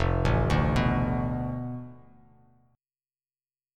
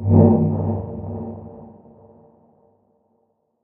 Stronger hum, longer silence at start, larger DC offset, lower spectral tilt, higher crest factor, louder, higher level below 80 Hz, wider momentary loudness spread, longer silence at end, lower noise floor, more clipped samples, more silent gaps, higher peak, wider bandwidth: neither; about the same, 0 s vs 0 s; neither; second, -7.5 dB/octave vs -15.5 dB/octave; about the same, 18 dB vs 22 dB; second, -27 LUFS vs -19 LUFS; first, -36 dBFS vs -48 dBFS; second, 14 LU vs 25 LU; second, 1.8 s vs 1.95 s; first, under -90 dBFS vs -67 dBFS; neither; neither; second, -10 dBFS vs 0 dBFS; first, 10.5 kHz vs 2 kHz